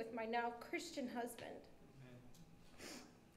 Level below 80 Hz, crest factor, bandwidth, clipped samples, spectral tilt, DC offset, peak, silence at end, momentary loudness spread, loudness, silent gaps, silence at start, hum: -74 dBFS; 20 dB; 16 kHz; under 0.1%; -4 dB/octave; under 0.1%; -28 dBFS; 0 s; 21 LU; -47 LUFS; none; 0 s; none